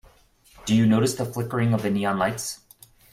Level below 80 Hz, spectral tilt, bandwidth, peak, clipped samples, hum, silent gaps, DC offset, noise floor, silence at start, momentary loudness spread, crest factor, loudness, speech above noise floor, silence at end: -54 dBFS; -5.5 dB/octave; 16 kHz; -8 dBFS; under 0.1%; none; none; under 0.1%; -56 dBFS; 0.65 s; 13 LU; 16 dB; -23 LUFS; 34 dB; 0.55 s